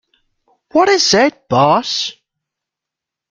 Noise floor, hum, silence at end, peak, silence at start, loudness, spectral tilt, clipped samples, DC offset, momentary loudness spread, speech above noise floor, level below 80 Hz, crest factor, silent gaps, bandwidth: -84 dBFS; none; 1.2 s; 0 dBFS; 0.75 s; -13 LUFS; -3.5 dB/octave; under 0.1%; under 0.1%; 9 LU; 71 dB; -56 dBFS; 16 dB; none; 9.4 kHz